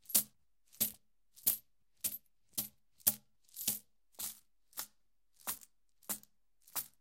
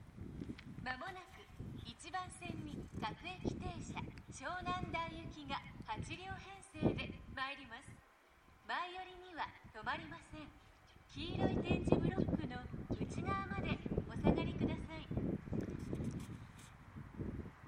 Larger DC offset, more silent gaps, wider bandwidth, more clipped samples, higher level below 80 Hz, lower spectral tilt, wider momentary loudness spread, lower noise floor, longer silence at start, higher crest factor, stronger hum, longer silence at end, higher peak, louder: neither; neither; first, 17 kHz vs 13 kHz; neither; second, -76 dBFS vs -54 dBFS; second, 0 dB/octave vs -6.5 dB/octave; about the same, 15 LU vs 16 LU; first, -80 dBFS vs -66 dBFS; about the same, 0.1 s vs 0 s; about the same, 30 dB vs 30 dB; neither; first, 0.15 s vs 0 s; about the same, -12 dBFS vs -14 dBFS; first, -38 LUFS vs -43 LUFS